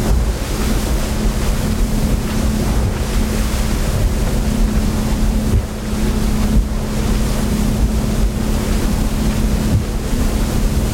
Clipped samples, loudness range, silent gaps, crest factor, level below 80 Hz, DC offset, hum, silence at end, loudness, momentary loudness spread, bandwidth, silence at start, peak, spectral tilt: under 0.1%; 0 LU; none; 12 dB; -18 dBFS; under 0.1%; none; 0 s; -19 LUFS; 2 LU; 16.5 kHz; 0 s; -4 dBFS; -5.5 dB/octave